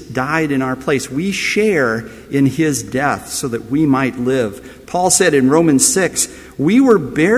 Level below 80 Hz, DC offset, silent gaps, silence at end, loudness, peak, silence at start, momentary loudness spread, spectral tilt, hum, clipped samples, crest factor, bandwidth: -46 dBFS; under 0.1%; none; 0 s; -15 LUFS; 0 dBFS; 0 s; 9 LU; -4 dB/octave; none; under 0.1%; 14 dB; 16 kHz